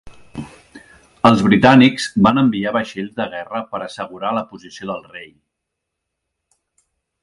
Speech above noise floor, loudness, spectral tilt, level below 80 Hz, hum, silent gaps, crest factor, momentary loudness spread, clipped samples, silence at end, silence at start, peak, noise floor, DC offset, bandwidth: 62 dB; -16 LUFS; -6 dB/octave; -50 dBFS; none; none; 18 dB; 23 LU; under 0.1%; 1.95 s; 0.05 s; 0 dBFS; -79 dBFS; under 0.1%; 11.5 kHz